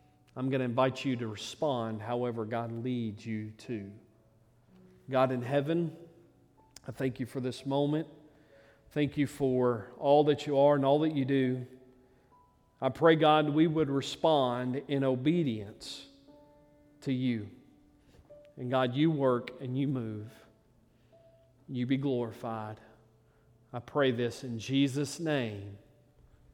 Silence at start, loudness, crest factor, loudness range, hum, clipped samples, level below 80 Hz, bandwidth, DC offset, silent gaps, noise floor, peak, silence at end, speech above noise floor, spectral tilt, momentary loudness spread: 0.35 s; -31 LUFS; 22 dB; 9 LU; none; under 0.1%; -68 dBFS; 15 kHz; under 0.1%; none; -65 dBFS; -10 dBFS; 0.75 s; 35 dB; -6.5 dB/octave; 17 LU